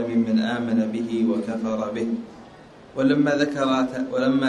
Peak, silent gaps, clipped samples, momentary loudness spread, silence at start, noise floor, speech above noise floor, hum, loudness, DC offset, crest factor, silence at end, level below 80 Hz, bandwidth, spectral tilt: -8 dBFS; none; under 0.1%; 8 LU; 0 s; -46 dBFS; 24 dB; none; -23 LUFS; under 0.1%; 14 dB; 0 s; -60 dBFS; 9.8 kHz; -6.5 dB/octave